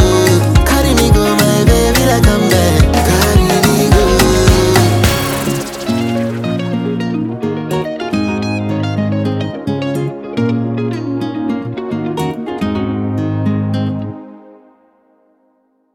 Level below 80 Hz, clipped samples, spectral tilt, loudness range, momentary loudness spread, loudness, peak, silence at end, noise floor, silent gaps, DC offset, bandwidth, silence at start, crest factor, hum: -22 dBFS; under 0.1%; -5.5 dB/octave; 9 LU; 9 LU; -13 LUFS; 0 dBFS; 1.55 s; -58 dBFS; none; under 0.1%; 19 kHz; 0 s; 14 dB; none